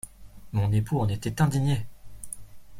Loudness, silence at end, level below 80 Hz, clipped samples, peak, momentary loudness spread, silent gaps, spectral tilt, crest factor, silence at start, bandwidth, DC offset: -27 LUFS; 0 s; -48 dBFS; under 0.1%; -10 dBFS; 19 LU; none; -6.5 dB/octave; 18 dB; 0.05 s; 15.5 kHz; under 0.1%